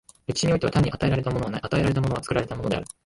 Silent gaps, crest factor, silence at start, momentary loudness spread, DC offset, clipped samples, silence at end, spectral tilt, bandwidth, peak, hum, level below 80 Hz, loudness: none; 16 dB; 0.3 s; 6 LU; under 0.1%; under 0.1%; 0.2 s; -6 dB/octave; 11.5 kHz; -8 dBFS; none; -42 dBFS; -25 LUFS